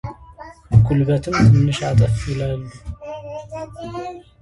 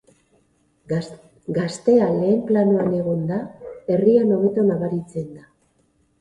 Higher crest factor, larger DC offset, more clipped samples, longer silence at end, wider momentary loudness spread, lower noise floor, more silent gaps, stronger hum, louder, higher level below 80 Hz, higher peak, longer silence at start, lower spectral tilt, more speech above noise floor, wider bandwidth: about the same, 18 dB vs 16 dB; neither; neither; second, 0.2 s vs 0.8 s; first, 20 LU vs 16 LU; second, -40 dBFS vs -63 dBFS; neither; neither; first, -17 LUFS vs -20 LUFS; first, -34 dBFS vs -58 dBFS; first, 0 dBFS vs -4 dBFS; second, 0.05 s vs 0.9 s; about the same, -7.5 dB/octave vs -8 dB/octave; second, 22 dB vs 44 dB; about the same, 11 kHz vs 10.5 kHz